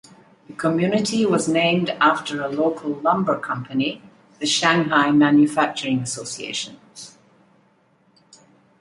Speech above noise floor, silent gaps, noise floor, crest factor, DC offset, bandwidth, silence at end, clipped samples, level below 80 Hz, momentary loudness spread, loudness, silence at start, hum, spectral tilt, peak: 40 dB; none; -60 dBFS; 20 dB; under 0.1%; 11.5 kHz; 1.7 s; under 0.1%; -66 dBFS; 14 LU; -20 LUFS; 0.5 s; none; -4.5 dB/octave; -2 dBFS